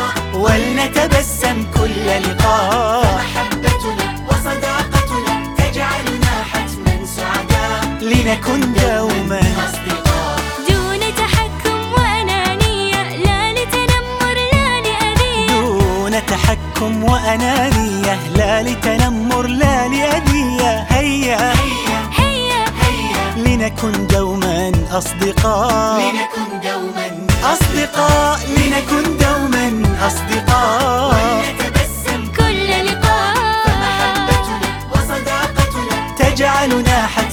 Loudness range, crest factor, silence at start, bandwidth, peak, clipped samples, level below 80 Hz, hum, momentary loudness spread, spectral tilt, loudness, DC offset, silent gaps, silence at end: 2 LU; 14 dB; 0 s; over 20 kHz; 0 dBFS; under 0.1%; -24 dBFS; none; 5 LU; -4.5 dB/octave; -15 LUFS; under 0.1%; none; 0 s